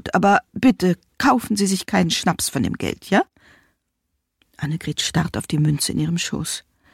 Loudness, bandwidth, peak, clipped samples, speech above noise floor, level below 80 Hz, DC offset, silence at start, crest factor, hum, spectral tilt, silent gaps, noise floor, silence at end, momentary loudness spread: -21 LUFS; 16.5 kHz; -6 dBFS; under 0.1%; 55 dB; -48 dBFS; under 0.1%; 0.05 s; 16 dB; none; -4.5 dB/octave; none; -75 dBFS; 0.35 s; 10 LU